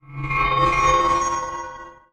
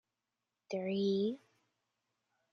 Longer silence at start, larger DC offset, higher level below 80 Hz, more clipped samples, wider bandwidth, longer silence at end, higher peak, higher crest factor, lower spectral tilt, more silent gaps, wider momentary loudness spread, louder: second, 0.1 s vs 0.7 s; neither; first, -36 dBFS vs -86 dBFS; neither; first, 11 kHz vs 7 kHz; second, 0.2 s vs 1.15 s; first, -8 dBFS vs -24 dBFS; about the same, 14 dB vs 16 dB; second, -4 dB/octave vs -7 dB/octave; neither; first, 16 LU vs 11 LU; first, -20 LUFS vs -36 LUFS